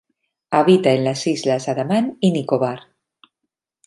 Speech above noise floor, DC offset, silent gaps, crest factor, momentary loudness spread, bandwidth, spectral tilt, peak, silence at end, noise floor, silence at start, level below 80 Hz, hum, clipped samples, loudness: 62 dB; under 0.1%; none; 18 dB; 7 LU; 11.5 kHz; -6 dB/octave; -2 dBFS; 1.05 s; -80 dBFS; 0.5 s; -66 dBFS; none; under 0.1%; -18 LUFS